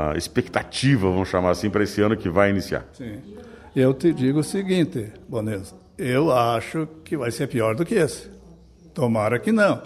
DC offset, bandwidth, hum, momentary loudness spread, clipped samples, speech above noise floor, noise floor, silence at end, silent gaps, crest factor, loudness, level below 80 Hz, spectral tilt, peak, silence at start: under 0.1%; 14 kHz; none; 14 LU; under 0.1%; 26 dB; -48 dBFS; 0 s; none; 20 dB; -22 LUFS; -48 dBFS; -6 dB/octave; -4 dBFS; 0 s